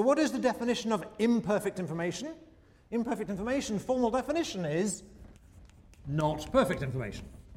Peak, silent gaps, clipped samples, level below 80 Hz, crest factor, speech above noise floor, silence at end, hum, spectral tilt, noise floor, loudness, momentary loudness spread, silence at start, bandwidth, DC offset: -14 dBFS; none; under 0.1%; -54 dBFS; 18 dB; 24 dB; 0 s; none; -5.5 dB/octave; -55 dBFS; -31 LUFS; 12 LU; 0 s; 16 kHz; under 0.1%